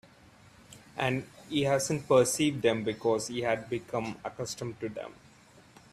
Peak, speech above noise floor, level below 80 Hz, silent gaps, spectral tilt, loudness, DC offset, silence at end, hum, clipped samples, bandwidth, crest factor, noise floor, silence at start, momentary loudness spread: -10 dBFS; 28 dB; -64 dBFS; none; -4.5 dB/octave; -30 LUFS; under 0.1%; 0.8 s; none; under 0.1%; 15.5 kHz; 20 dB; -57 dBFS; 0.7 s; 14 LU